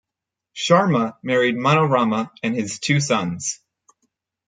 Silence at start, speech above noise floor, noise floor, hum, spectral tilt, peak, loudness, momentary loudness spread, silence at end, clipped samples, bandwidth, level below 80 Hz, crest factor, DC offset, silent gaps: 0.55 s; 66 dB; -85 dBFS; none; -5 dB/octave; -2 dBFS; -20 LUFS; 11 LU; 0.95 s; under 0.1%; 9.4 kHz; -64 dBFS; 18 dB; under 0.1%; none